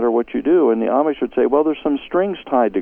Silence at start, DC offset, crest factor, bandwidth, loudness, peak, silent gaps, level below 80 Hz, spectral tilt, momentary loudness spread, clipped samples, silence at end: 0 s; under 0.1%; 14 dB; 3.6 kHz; -18 LUFS; -4 dBFS; none; -52 dBFS; -9 dB/octave; 5 LU; under 0.1%; 0 s